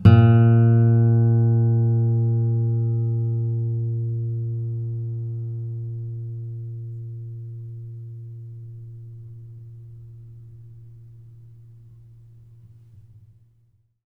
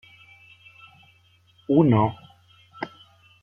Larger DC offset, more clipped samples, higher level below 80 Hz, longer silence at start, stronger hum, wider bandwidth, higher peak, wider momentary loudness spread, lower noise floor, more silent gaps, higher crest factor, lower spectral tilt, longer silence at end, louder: neither; neither; first, -50 dBFS vs -62 dBFS; second, 0 s vs 1.7 s; neither; second, 3.1 kHz vs 5.6 kHz; first, 0 dBFS vs -6 dBFS; about the same, 25 LU vs 24 LU; about the same, -62 dBFS vs -59 dBFS; neither; about the same, 22 dB vs 20 dB; first, -11.5 dB/octave vs -10 dB/octave; first, 2.5 s vs 0.55 s; about the same, -21 LUFS vs -21 LUFS